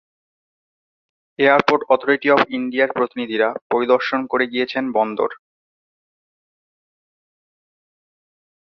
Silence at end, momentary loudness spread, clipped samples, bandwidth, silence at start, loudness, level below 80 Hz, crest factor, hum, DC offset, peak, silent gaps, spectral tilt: 3.35 s; 6 LU; under 0.1%; 6.6 kHz; 1.4 s; -18 LUFS; -66 dBFS; 20 dB; none; under 0.1%; -2 dBFS; 3.62-3.70 s; -6 dB/octave